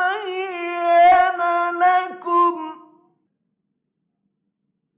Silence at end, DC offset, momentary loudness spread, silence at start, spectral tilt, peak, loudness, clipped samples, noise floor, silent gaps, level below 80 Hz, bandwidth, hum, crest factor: 2.2 s; under 0.1%; 13 LU; 0 s; -6 dB/octave; -8 dBFS; -18 LUFS; under 0.1%; -75 dBFS; none; -64 dBFS; 4 kHz; none; 12 dB